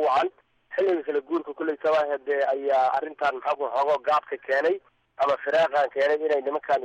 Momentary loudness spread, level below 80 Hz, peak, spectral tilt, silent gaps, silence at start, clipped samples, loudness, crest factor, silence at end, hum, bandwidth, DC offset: 5 LU; -72 dBFS; -12 dBFS; -4.5 dB/octave; none; 0 s; under 0.1%; -25 LUFS; 12 dB; 0 s; none; 9.2 kHz; under 0.1%